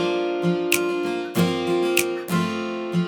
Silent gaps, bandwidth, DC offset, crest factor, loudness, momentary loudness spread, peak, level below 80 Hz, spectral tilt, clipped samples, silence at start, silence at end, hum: none; over 20 kHz; under 0.1%; 22 dB; -23 LUFS; 5 LU; -2 dBFS; -68 dBFS; -5 dB/octave; under 0.1%; 0 s; 0 s; none